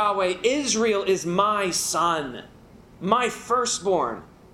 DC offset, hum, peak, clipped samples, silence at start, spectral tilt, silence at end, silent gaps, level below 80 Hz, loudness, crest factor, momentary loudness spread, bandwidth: under 0.1%; none; -4 dBFS; under 0.1%; 0 s; -3 dB/octave; 0.3 s; none; -58 dBFS; -23 LUFS; 20 dB; 9 LU; 16 kHz